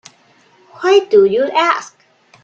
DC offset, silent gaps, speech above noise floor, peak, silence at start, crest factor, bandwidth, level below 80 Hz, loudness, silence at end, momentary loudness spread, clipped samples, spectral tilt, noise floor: under 0.1%; none; 39 dB; 0 dBFS; 0.8 s; 14 dB; 7.6 kHz; -64 dBFS; -13 LUFS; 0.55 s; 9 LU; under 0.1%; -4 dB/octave; -51 dBFS